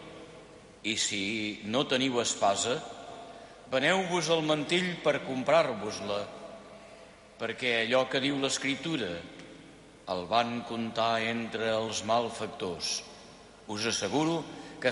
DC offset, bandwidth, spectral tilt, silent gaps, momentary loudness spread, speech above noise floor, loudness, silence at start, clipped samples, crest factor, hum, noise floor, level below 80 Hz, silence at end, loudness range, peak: under 0.1%; 11.5 kHz; -3 dB/octave; none; 21 LU; 23 dB; -30 LUFS; 0 s; under 0.1%; 18 dB; none; -52 dBFS; -64 dBFS; 0 s; 3 LU; -12 dBFS